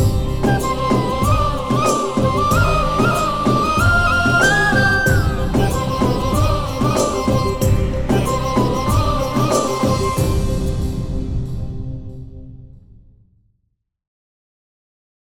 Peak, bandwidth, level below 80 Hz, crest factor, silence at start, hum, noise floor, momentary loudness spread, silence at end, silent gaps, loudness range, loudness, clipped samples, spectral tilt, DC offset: -2 dBFS; 18.5 kHz; -26 dBFS; 14 dB; 0 s; none; -70 dBFS; 10 LU; 2.6 s; none; 12 LU; -17 LUFS; under 0.1%; -5.5 dB/octave; under 0.1%